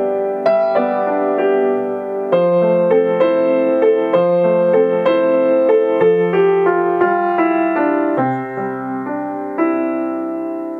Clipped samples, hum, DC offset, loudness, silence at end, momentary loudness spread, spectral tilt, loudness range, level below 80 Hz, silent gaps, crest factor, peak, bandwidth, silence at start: under 0.1%; none; under 0.1%; -16 LUFS; 0 s; 9 LU; -9 dB/octave; 4 LU; -66 dBFS; none; 14 dB; 0 dBFS; 5 kHz; 0 s